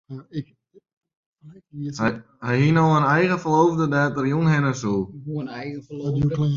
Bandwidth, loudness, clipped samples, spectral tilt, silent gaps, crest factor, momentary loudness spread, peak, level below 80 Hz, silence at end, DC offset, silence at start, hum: 7.4 kHz; -21 LUFS; under 0.1%; -7 dB/octave; 0.93-1.01 s, 1.17-1.33 s; 16 dB; 16 LU; -6 dBFS; -54 dBFS; 0 s; under 0.1%; 0.1 s; none